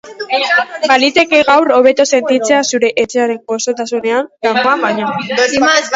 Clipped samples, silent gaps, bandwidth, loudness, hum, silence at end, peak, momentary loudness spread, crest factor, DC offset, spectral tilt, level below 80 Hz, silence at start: under 0.1%; none; 8 kHz; -12 LUFS; none; 0 s; 0 dBFS; 8 LU; 12 dB; under 0.1%; -2.5 dB/octave; -56 dBFS; 0.05 s